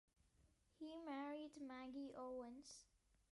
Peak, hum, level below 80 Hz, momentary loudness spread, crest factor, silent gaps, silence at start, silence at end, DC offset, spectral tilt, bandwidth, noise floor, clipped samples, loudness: -40 dBFS; none; -82 dBFS; 9 LU; 14 dB; none; 0.4 s; 0.5 s; under 0.1%; -3.5 dB/octave; 11.5 kHz; -78 dBFS; under 0.1%; -54 LUFS